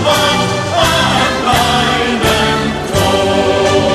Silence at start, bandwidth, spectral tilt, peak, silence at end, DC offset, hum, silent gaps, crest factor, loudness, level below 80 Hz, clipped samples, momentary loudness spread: 0 s; 15.5 kHz; -4 dB/octave; 0 dBFS; 0 s; under 0.1%; none; none; 12 dB; -12 LUFS; -30 dBFS; under 0.1%; 3 LU